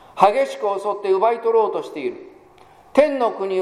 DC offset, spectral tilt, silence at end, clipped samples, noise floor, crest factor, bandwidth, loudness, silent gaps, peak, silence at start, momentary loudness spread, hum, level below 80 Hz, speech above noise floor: under 0.1%; -5 dB/octave; 0 s; under 0.1%; -49 dBFS; 20 dB; 13.5 kHz; -20 LUFS; none; 0 dBFS; 0.15 s; 12 LU; none; -62 dBFS; 30 dB